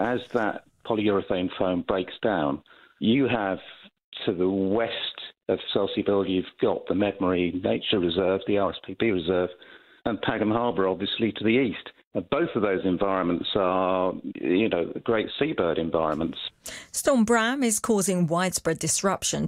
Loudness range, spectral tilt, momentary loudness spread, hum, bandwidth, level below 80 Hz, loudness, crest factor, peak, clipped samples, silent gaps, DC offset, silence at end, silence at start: 2 LU; -4.5 dB/octave; 8 LU; none; 16 kHz; -56 dBFS; -25 LUFS; 18 dB; -8 dBFS; under 0.1%; 4.04-4.12 s, 12.04-12.11 s; under 0.1%; 0 s; 0 s